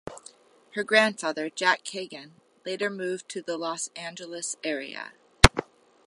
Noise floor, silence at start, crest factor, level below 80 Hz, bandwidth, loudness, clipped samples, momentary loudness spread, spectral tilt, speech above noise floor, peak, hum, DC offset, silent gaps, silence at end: -53 dBFS; 0.05 s; 28 dB; -38 dBFS; 16 kHz; -26 LUFS; under 0.1%; 20 LU; -3.5 dB/octave; 24 dB; 0 dBFS; none; under 0.1%; none; 0.45 s